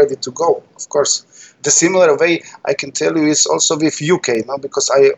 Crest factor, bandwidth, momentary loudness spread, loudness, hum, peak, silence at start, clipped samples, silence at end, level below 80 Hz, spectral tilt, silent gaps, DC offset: 14 dB; 8.6 kHz; 9 LU; -15 LUFS; none; 0 dBFS; 0 s; under 0.1%; 0 s; -68 dBFS; -2.5 dB/octave; none; under 0.1%